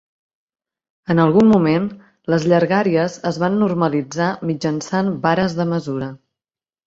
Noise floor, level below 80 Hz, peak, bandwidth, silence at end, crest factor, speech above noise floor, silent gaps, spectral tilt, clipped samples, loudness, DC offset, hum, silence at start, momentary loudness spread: under -90 dBFS; -56 dBFS; -2 dBFS; 7.8 kHz; 0.7 s; 16 dB; over 73 dB; none; -7 dB/octave; under 0.1%; -18 LUFS; under 0.1%; none; 1.1 s; 12 LU